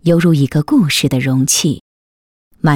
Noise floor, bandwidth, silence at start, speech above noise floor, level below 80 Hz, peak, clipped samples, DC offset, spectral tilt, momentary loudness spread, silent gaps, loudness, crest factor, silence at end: under -90 dBFS; 18 kHz; 0.05 s; over 78 dB; -46 dBFS; -4 dBFS; under 0.1%; under 0.1%; -5 dB/octave; 7 LU; 1.81-2.51 s; -13 LUFS; 10 dB; 0 s